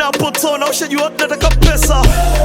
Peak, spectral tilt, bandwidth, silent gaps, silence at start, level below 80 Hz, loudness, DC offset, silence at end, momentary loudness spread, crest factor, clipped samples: 0 dBFS; -4 dB/octave; 17 kHz; none; 0 s; -16 dBFS; -14 LUFS; under 0.1%; 0 s; 4 LU; 12 dB; 0.2%